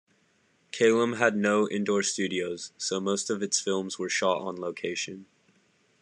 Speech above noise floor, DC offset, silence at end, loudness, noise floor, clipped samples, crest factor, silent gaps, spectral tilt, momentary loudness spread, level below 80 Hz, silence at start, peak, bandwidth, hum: 40 dB; under 0.1%; 0.75 s; -27 LUFS; -67 dBFS; under 0.1%; 22 dB; none; -3.5 dB/octave; 10 LU; -80 dBFS; 0.75 s; -8 dBFS; 11 kHz; none